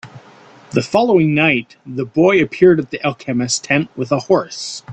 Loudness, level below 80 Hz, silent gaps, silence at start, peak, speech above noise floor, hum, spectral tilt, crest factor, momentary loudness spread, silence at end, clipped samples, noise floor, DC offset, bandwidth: -16 LUFS; -54 dBFS; none; 0.05 s; 0 dBFS; 28 dB; none; -5 dB/octave; 16 dB; 10 LU; 0 s; under 0.1%; -43 dBFS; under 0.1%; 9 kHz